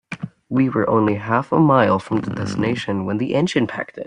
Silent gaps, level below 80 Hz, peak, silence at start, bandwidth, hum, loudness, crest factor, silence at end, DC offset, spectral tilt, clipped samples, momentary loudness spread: none; -56 dBFS; -2 dBFS; 0.1 s; 10 kHz; none; -19 LUFS; 16 dB; 0 s; under 0.1%; -7 dB/octave; under 0.1%; 9 LU